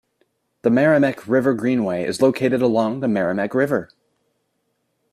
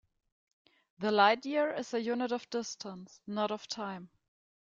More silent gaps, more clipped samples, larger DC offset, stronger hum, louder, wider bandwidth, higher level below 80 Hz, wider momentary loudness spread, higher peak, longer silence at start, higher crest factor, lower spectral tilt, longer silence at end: neither; neither; neither; neither; first, -19 LUFS vs -33 LUFS; first, 14 kHz vs 7.8 kHz; first, -62 dBFS vs -80 dBFS; second, 6 LU vs 17 LU; first, -4 dBFS vs -12 dBFS; second, 0.65 s vs 1 s; second, 16 dB vs 22 dB; first, -7 dB/octave vs -4 dB/octave; first, 1.25 s vs 0.65 s